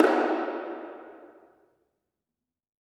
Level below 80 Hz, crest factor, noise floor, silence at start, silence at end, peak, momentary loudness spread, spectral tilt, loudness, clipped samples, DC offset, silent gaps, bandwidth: -88 dBFS; 26 dB; -89 dBFS; 0 s; 1.6 s; -4 dBFS; 24 LU; -4 dB/octave; -29 LUFS; under 0.1%; under 0.1%; none; 12.5 kHz